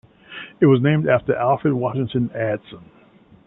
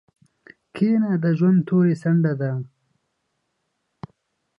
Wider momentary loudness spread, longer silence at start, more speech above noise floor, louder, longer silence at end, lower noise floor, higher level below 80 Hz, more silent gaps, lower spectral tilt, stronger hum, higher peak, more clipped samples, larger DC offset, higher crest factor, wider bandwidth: first, 17 LU vs 13 LU; second, 0.3 s vs 0.75 s; second, 32 dB vs 56 dB; about the same, -19 LUFS vs -20 LUFS; second, 0.65 s vs 1.95 s; second, -51 dBFS vs -75 dBFS; first, -56 dBFS vs -68 dBFS; neither; first, -12 dB/octave vs -10 dB/octave; neither; first, -2 dBFS vs -8 dBFS; neither; neither; about the same, 18 dB vs 14 dB; second, 4 kHz vs 5.4 kHz